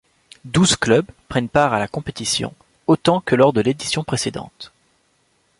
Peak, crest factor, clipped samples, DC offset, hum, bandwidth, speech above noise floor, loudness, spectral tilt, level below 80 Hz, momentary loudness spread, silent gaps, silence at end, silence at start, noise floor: -2 dBFS; 18 dB; under 0.1%; under 0.1%; none; 11.5 kHz; 44 dB; -19 LUFS; -4.5 dB/octave; -48 dBFS; 14 LU; none; 0.95 s; 0.45 s; -63 dBFS